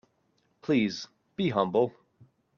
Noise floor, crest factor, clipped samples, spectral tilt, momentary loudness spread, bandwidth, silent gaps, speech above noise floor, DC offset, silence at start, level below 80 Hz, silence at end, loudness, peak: -72 dBFS; 20 dB; under 0.1%; -6.5 dB/octave; 14 LU; 7.2 kHz; none; 45 dB; under 0.1%; 0.65 s; -70 dBFS; 0.7 s; -28 LUFS; -12 dBFS